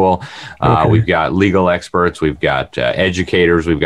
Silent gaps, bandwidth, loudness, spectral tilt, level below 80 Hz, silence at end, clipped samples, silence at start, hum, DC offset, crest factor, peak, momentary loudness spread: none; 11 kHz; -14 LUFS; -6.5 dB/octave; -38 dBFS; 0 s; under 0.1%; 0 s; none; 0.3%; 14 dB; 0 dBFS; 5 LU